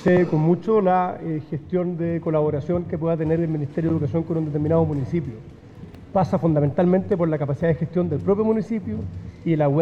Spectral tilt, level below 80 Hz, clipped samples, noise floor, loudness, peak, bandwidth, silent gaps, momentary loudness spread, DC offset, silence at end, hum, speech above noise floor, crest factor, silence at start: -10 dB/octave; -50 dBFS; under 0.1%; -41 dBFS; -22 LUFS; -8 dBFS; 6.8 kHz; none; 10 LU; under 0.1%; 0 s; none; 20 dB; 14 dB; 0 s